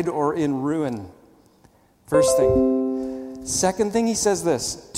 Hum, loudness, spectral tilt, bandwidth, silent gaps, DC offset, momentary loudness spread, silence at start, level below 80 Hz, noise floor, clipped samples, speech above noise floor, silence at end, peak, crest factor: none; -22 LUFS; -4.5 dB/octave; 16.5 kHz; none; under 0.1%; 11 LU; 0 s; -46 dBFS; -56 dBFS; under 0.1%; 35 dB; 0 s; -6 dBFS; 18 dB